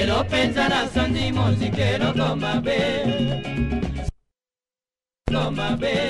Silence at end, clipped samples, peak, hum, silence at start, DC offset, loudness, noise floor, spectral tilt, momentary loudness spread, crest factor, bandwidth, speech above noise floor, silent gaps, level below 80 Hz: 0 s; under 0.1%; -6 dBFS; none; 0 s; under 0.1%; -22 LUFS; under -90 dBFS; -6 dB/octave; 6 LU; 16 dB; 11.5 kHz; over 68 dB; none; -36 dBFS